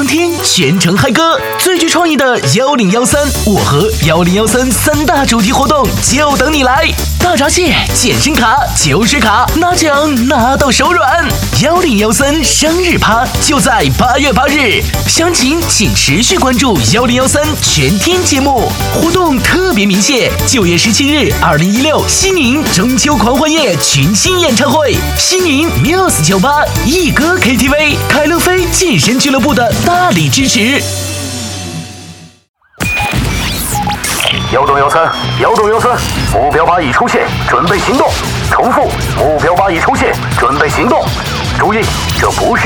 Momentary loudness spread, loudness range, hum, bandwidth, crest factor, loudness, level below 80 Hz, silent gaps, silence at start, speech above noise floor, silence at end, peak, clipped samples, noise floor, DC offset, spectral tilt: 4 LU; 2 LU; none; over 20 kHz; 10 dB; -9 LUFS; -24 dBFS; 32.49-32.54 s; 0 s; 23 dB; 0 s; 0 dBFS; under 0.1%; -32 dBFS; under 0.1%; -3.5 dB/octave